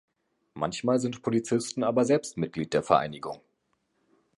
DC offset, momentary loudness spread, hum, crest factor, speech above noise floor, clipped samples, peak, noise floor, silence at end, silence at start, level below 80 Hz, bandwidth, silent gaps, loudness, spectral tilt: under 0.1%; 11 LU; none; 22 dB; 48 dB; under 0.1%; -6 dBFS; -75 dBFS; 1 s; 0.55 s; -64 dBFS; 11.5 kHz; none; -27 LUFS; -5.5 dB/octave